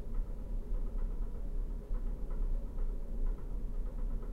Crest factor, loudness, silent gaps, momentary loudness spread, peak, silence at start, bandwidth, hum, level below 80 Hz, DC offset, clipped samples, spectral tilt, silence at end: 10 dB; -43 LUFS; none; 2 LU; -24 dBFS; 0 s; 2.1 kHz; none; -36 dBFS; under 0.1%; under 0.1%; -9 dB/octave; 0 s